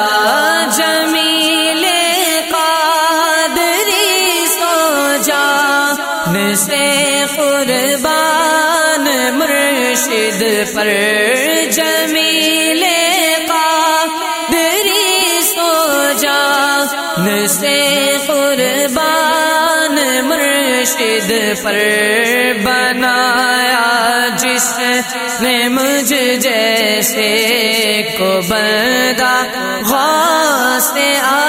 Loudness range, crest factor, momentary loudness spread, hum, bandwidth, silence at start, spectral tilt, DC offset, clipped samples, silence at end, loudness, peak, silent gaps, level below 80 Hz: 1 LU; 12 dB; 3 LU; none; 16.5 kHz; 0 s; -1.5 dB/octave; under 0.1%; under 0.1%; 0 s; -12 LUFS; 0 dBFS; none; -52 dBFS